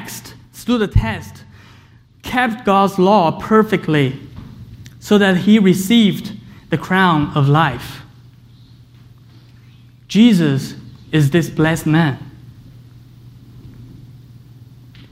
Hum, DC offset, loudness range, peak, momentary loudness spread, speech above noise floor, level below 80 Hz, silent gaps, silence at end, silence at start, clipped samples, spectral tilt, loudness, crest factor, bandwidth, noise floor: none; under 0.1%; 5 LU; 0 dBFS; 23 LU; 32 dB; -38 dBFS; none; 1.05 s; 0 s; under 0.1%; -6.5 dB/octave; -15 LUFS; 18 dB; 16 kHz; -46 dBFS